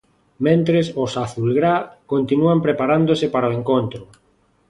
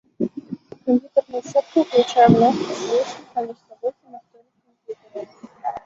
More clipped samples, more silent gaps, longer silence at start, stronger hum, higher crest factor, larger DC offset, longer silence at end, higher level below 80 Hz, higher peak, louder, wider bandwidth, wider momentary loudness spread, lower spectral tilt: neither; neither; first, 0.4 s vs 0.2 s; neither; about the same, 16 dB vs 20 dB; neither; first, 0.65 s vs 0.05 s; first, -54 dBFS vs -60 dBFS; about the same, -2 dBFS vs -2 dBFS; about the same, -19 LUFS vs -20 LUFS; first, 11 kHz vs 7.8 kHz; second, 7 LU vs 22 LU; about the same, -7.5 dB/octave vs -6.5 dB/octave